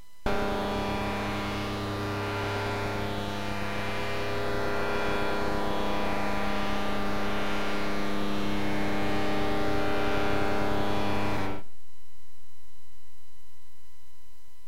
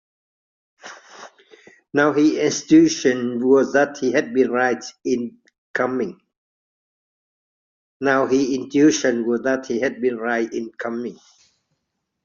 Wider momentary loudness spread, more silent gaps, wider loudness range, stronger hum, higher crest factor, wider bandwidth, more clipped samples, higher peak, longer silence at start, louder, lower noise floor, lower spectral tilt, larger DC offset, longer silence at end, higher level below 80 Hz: second, 3 LU vs 13 LU; second, none vs 5.58-5.74 s, 6.37-8.00 s; second, 4 LU vs 7 LU; neither; about the same, 14 dB vs 18 dB; first, 16 kHz vs 7.4 kHz; neither; second, -14 dBFS vs -4 dBFS; second, 0 s vs 0.85 s; second, -30 LUFS vs -20 LUFS; second, -59 dBFS vs -77 dBFS; first, -5.5 dB/octave vs -4 dB/octave; first, 5% vs under 0.1%; second, 0 s vs 1.1 s; first, -44 dBFS vs -64 dBFS